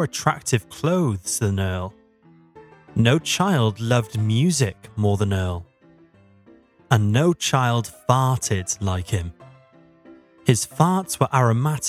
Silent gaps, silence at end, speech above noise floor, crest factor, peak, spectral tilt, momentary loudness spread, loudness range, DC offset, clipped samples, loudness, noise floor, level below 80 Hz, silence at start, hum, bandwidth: none; 0 s; 33 dB; 22 dB; 0 dBFS; -5 dB/octave; 7 LU; 2 LU; under 0.1%; under 0.1%; -21 LUFS; -53 dBFS; -50 dBFS; 0 s; none; 15.5 kHz